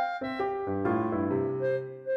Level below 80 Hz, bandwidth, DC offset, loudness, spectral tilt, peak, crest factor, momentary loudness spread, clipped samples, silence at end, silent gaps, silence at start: -62 dBFS; 6 kHz; under 0.1%; -30 LUFS; -9 dB/octave; -16 dBFS; 14 dB; 3 LU; under 0.1%; 0 s; none; 0 s